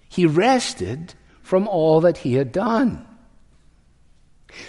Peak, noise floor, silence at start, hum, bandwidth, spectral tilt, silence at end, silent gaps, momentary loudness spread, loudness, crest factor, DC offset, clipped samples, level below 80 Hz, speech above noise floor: -4 dBFS; -54 dBFS; 0.1 s; none; 11.5 kHz; -6 dB/octave; 0 s; none; 14 LU; -19 LUFS; 18 dB; under 0.1%; under 0.1%; -52 dBFS; 35 dB